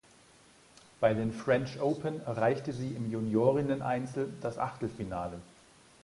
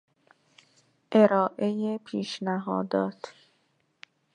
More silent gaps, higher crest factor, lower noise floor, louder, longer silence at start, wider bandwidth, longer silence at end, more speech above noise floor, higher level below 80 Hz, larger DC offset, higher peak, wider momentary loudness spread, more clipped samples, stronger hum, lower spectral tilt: neither; about the same, 20 dB vs 24 dB; second, -60 dBFS vs -71 dBFS; second, -32 LUFS vs -27 LUFS; about the same, 1 s vs 1.1 s; first, 11.5 kHz vs 10 kHz; second, 0.55 s vs 1.05 s; second, 29 dB vs 45 dB; first, -60 dBFS vs -78 dBFS; neither; second, -12 dBFS vs -4 dBFS; second, 9 LU vs 12 LU; neither; neither; about the same, -7.5 dB/octave vs -7 dB/octave